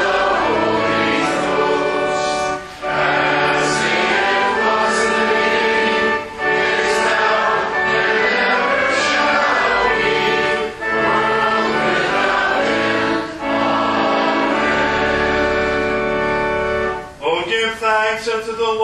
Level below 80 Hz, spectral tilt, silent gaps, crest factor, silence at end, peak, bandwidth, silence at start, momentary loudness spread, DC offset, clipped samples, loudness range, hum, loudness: -42 dBFS; -3.5 dB/octave; none; 14 dB; 0 s; -2 dBFS; 12 kHz; 0 s; 5 LU; under 0.1%; under 0.1%; 2 LU; none; -16 LUFS